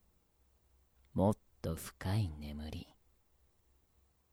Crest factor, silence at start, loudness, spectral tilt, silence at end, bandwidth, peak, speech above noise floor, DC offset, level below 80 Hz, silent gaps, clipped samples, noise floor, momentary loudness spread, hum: 22 dB; 1.15 s; -39 LUFS; -7 dB/octave; 1.5 s; over 20 kHz; -20 dBFS; 36 dB; under 0.1%; -56 dBFS; none; under 0.1%; -73 dBFS; 13 LU; none